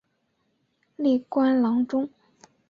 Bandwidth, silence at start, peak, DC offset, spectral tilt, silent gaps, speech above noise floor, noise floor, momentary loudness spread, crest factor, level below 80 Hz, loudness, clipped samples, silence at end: 6.8 kHz; 1 s; -12 dBFS; under 0.1%; -7 dB/octave; none; 50 dB; -73 dBFS; 7 LU; 14 dB; -70 dBFS; -24 LUFS; under 0.1%; 0.6 s